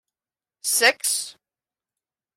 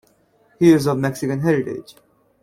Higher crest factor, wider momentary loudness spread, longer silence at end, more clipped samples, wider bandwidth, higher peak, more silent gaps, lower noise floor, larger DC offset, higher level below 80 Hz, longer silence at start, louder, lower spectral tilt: about the same, 22 dB vs 18 dB; about the same, 13 LU vs 12 LU; first, 1.05 s vs 0.6 s; neither; about the same, 16.5 kHz vs 15 kHz; about the same, -4 dBFS vs -2 dBFS; neither; first, under -90 dBFS vs -58 dBFS; neither; second, -82 dBFS vs -54 dBFS; about the same, 0.65 s vs 0.6 s; about the same, -20 LUFS vs -18 LUFS; second, 2.5 dB/octave vs -7 dB/octave